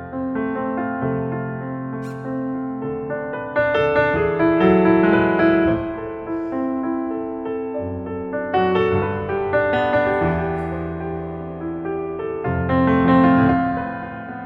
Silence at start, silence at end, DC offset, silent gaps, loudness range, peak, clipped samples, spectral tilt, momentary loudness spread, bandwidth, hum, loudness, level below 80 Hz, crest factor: 0 s; 0 s; under 0.1%; none; 6 LU; -4 dBFS; under 0.1%; -9 dB/octave; 13 LU; 5.6 kHz; none; -20 LUFS; -44 dBFS; 16 dB